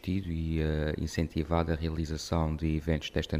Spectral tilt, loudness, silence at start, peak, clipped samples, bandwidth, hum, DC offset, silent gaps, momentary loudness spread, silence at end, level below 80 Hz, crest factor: -6.5 dB/octave; -32 LUFS; 0.05 s; -14 dBFS; under 0.1%; 15 kHz; none; under 0.1%; none; 3 LU; 0 s; -38 dBFS; 16 dB